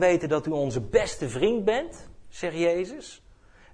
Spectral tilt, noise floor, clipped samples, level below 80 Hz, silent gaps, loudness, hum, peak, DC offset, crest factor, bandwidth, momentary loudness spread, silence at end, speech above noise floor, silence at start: -5.5 dB/octave; -53 dBFS; under 0.1%; -48 dBFS; none; -26 LUFS; none; -8 dBFS; under 0.1%; 20 dB; 10.5 kHz; 13 LU; 0.55 s; 28 dB; 0 s